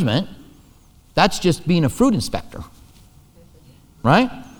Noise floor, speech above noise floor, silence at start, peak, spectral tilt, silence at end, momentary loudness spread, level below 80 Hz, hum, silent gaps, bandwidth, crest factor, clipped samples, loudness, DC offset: -50 dBFS; 32 dB; 0 s; -2 dBFS; -5.5 dB/octave; 0.15 s; 19 LU; -42 dBFS; none; none; over 20 kHz; 20 dB; under 0.1%; -19 LUFS; under 0.1%